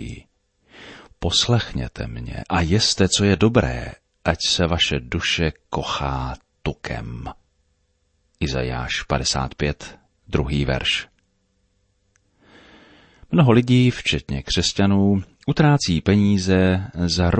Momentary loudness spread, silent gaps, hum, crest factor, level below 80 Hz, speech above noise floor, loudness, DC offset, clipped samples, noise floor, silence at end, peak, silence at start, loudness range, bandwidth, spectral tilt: 14 LU; none; none; 18 dB; -36 dBFS; 47 dB; -20 LUFS; under 0.1%; under 0.1%; -67 dBFS; 0 s; -2 dBFS; 0 s; 8 LU; 8.8 kHz; -5 dB/octave